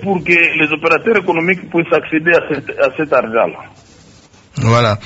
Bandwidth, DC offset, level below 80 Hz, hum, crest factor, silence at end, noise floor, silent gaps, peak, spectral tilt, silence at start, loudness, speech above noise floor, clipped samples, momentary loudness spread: 8 kHz; under 0.1%; -46 dBFS; none; 14 dB; 0 s; -44 dBFS; none; 0 dBFS; -6.5 dB/octave; 0 s; -13 LUFS; 30 dB; under 0.1%; 9 LU